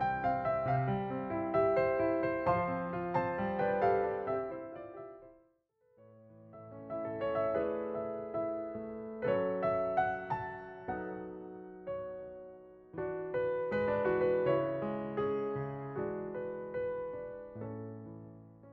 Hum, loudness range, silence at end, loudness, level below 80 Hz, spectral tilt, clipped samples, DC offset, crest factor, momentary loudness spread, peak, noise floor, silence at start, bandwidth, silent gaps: none; 8 LU; 0 s; -35 LUFS; -62 dBFS; -9.5 dB/octave; under 0.1%; under 0.1%; 18 dB; 17 LU; -18 dBFS; -72 dBFS; 0 s; 5.8 kHz; none